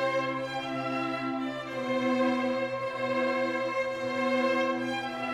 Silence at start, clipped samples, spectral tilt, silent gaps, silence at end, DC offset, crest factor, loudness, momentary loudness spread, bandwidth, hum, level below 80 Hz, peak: 0 s; under 0.1%; -5 dB/octave; none; 0 s; under 0.1%; 14 dB; -30 LUFS; 6 LU; 12 kHz; none; -70 dBFS; -16 dBFS